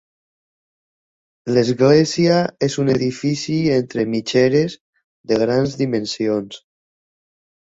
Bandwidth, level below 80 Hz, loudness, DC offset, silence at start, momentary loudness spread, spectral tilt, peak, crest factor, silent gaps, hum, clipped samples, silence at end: 8 kHz; -54 dBFS; -18 LUFS; under 0.1%; 1.45 s; 8 LU; -6 dB/octave; -2 dBFS; 18 dB; 4.81-4.93 s, 5.04-5.24 s; none; under 0.1%; 1.05 s